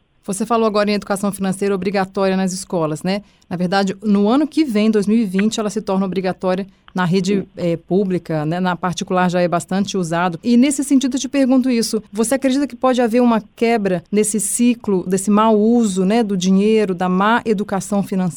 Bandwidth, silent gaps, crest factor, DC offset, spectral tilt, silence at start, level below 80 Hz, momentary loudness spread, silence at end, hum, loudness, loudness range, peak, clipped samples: 18.5 kHz; none; 12 dB; under 0.1%; -5.5 dB/octave; 0.3 s; -52 dBFS; 7 LU; 0 s; none; -17 LUFS; 4 LU; -4 dBFS; under 0.1%